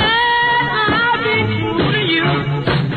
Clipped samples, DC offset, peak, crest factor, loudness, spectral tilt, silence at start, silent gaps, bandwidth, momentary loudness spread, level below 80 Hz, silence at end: under 0.1%; under 0.1%; -4 dBFS; 12 dB; -15 LUFS; -7.5 dB/octave; 0 s; none; 9 kHz; 5 LU; -40 dBFS; 0 s